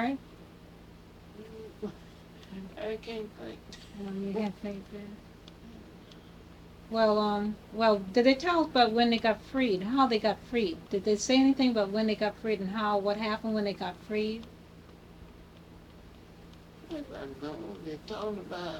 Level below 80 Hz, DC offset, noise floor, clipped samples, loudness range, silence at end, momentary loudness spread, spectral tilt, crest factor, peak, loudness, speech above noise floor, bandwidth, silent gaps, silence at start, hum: -58 dBFS; under 0.1%; -52 dBFS; under 0.1%; 16 LU; 0 s; 25 LU; -5 dB/octave; 22 dB; -10 dBFS; -29 LUFS; 22 dB; 14 kHz; none; 0 s; none